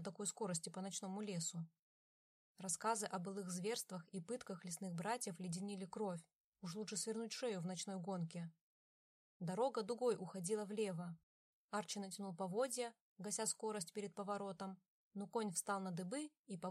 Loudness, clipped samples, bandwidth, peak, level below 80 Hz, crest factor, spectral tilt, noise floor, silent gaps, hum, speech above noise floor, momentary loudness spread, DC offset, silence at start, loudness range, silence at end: -45 LUFS; under 0.1%; 15 kHz; -26 dBFS; under -90 dBFS; 20 dB; -4 dB/octave; under -90 dBFS; 1.79-2.55 s, 6.35-6.52 s, 8.61-9.40 s, 11.23-11.69 s, 13.00-13.16 s, 14.88-15.11 s, 16.39-16.44 s; none; over 45 dB; 10 LU; under 0.1%; 0 s; 2 LU; 0 s